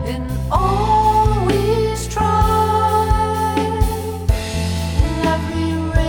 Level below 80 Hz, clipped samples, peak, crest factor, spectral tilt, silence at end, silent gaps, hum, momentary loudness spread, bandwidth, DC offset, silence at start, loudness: -24 dBFS; under 0.1%; -2 dBFS; 14 dB; -6 dB/octave; 0 s; none; none; 6 LU; 19.5 kHz; under 0.1%; 0 s; -18 LUFS